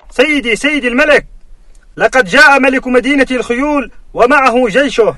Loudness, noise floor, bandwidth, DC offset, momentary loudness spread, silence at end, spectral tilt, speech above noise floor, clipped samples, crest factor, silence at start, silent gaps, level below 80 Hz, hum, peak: -10 LUFS; -36 dBFS; 12 kHz; under 0.1%; 8 LU; 0 s; -3.5 dB/octave; 26 dB; 0.9%; 10 dB; 0.15 s; none; -36 dBFS; none; 0 dBFS